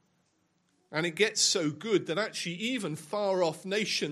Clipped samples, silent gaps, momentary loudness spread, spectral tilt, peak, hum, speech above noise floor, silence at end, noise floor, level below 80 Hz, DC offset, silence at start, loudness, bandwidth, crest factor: under 0.1%; none; 8 LU; -3 dB/octave; -10 dBFS; none; 43 dB; 0 s; -73 dBFS; -80 dBFS; under 0.1%; 0.9 s; -29 LUFS; 15.5 kHz; 20 dB